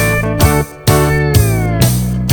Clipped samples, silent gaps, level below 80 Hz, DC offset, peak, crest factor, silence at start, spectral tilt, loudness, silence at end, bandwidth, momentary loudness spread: under 0.1%; none; -22 dBFS; under 0.1%; 0 dBFS; 12 dB; 0 s; -5.5 dB/octave; -12 LUFS; 0 s; over 20 kHz; 2 LU